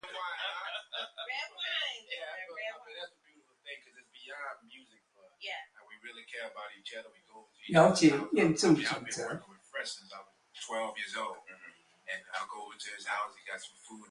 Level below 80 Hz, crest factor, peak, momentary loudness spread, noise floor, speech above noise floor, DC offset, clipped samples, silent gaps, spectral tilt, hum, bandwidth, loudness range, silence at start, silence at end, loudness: -72 dBFS; 24 dB; -10 dBFS; 24 LU; -68 dBFS; 36 dB; under 0.1%; under 0.1%; none; -4.5 dB/octave; none; 11.5 kHz; 17 LU; 0.05 s; 0.05 s; -33 LUFS